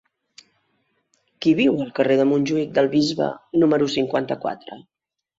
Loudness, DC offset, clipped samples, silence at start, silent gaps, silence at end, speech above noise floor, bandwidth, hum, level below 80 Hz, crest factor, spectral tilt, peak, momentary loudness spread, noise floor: -20 LUFS; under 0.1%; under 0.1%; 1.4 s; none; 0.6 s; 49 dB; 7.8 kHz; none; -62 dBFS; 18 dB; -6 dB/octave; -4 dBFS; 9 LU; -69 dBFS